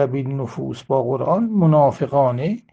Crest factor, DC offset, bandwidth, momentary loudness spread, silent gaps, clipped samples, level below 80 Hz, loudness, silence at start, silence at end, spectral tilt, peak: 14 dB; under 0.1%; 7.8 kHz; 11 LU; none; under 0.1%; -58 dBFS; -19 LUFS; 0 s; 0.15 s; -9.5 dB/octave; -4 dBFS